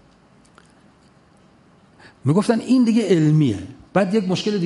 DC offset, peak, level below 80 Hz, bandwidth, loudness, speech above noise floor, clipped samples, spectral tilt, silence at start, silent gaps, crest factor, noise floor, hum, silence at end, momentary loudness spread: under 0.1%; -4 dBFS; -54 dBFS; 11.5 kHz; -19 LUFS; 35 dB; under 0.1%; -7 dB/octave; 2.25 s; none; 16 dB; -53 dBFS; none; 0 s; 7 LU